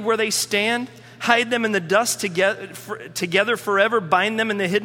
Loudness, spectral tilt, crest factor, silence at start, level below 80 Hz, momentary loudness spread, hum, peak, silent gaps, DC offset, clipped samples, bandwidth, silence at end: -20 LUFS; -3 dB/octave; 20 dB; 0 s; -68 dBFS; 11 LU; none; 0 dBFS; none; under 0.1%; under 0.1%; 17.5 kHz; 0 s